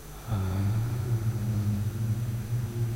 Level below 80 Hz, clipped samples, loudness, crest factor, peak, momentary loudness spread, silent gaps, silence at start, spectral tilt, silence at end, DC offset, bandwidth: -44 dBFS; under 0.1%; -30 LUFS; 10 dB; -18 dBFS; 3 LU; none; 0 s; -7 dB/octave; 0 s; under 0.1%; 16 kHz